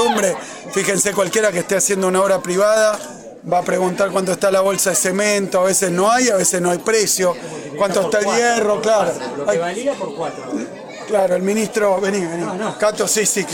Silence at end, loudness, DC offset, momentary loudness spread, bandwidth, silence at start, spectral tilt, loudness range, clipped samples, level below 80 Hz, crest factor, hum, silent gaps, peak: 0 s; -17 LUFS; under 0.1%; 10 LU; 17.5 kHz; 0 s; -3 dB/octave; 4 LU; under 0.1%; -58 dBFS; 14 dB; none; none; -4 dBFS